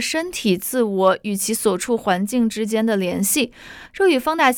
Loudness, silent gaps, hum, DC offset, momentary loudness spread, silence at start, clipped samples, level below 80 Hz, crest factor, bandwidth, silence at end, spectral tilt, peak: -20 LUFS; none; none; under 0.1%; 4 LU; 0 s; under 0.1%; -54 dBFS; 16 dB; over 20 kHz; 0 s; -4 dB/octave; -4 dBFS